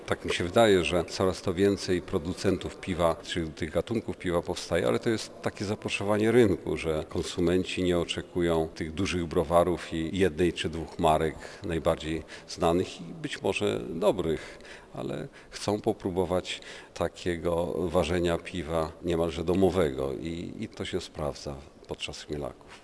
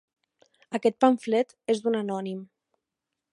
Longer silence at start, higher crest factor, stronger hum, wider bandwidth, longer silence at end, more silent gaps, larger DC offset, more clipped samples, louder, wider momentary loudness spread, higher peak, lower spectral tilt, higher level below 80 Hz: second, 0 s vs 0.7 s; about the same, 20 dB vs 22 dB; neither; about the same, 11 kHz vs 11.5 kHz; second, 0.05 s vs 0.9 s; neither; neither; neither; second, -29 LUFS vs -26 LUFS; about the same, 12 LU vs 13 LU; about the same, -8 dBFS vs -6 dBFS; about the same, -5.5 dB/octave vs -6 dB/octave; first, -48 dBFS vs -82 dBFS